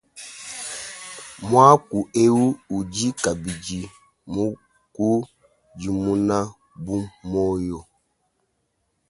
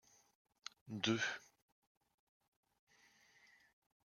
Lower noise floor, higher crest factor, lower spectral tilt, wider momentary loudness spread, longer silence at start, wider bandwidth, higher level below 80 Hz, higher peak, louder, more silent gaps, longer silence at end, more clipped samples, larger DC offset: about the same, -72 dBFS vs -71 dBFS; second, 22 dB vs 30 dB; first, -5.5 dB/octave vs -3.5 dB/octave; about the same, 20 LU vs 18 LU; second, 0.15 s vs 0.85 s; second, 11.5 kHz vs 14 kHz; first, -50 dBFS vs -88 dBFS; first, 0 dBFS vs -20 dBFS; first, -22 LUFS vs -41 LUFS; neither; second, 1.3 s vs 2.65 s; neither; neither